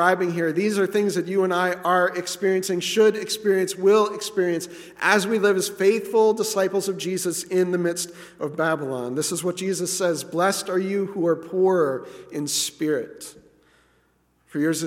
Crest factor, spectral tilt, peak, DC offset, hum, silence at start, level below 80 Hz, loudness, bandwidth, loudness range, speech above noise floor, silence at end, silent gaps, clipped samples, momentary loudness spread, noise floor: 20 dB; -4 dB/octave; -4 dBFS; under 0.1%; none; 0 s; -70 dBFS; -23 LUFS; 16.5 kHz; 4 LU; 42 dB; 0 s; none; under 0.1%; 8 LU; -64 dBFS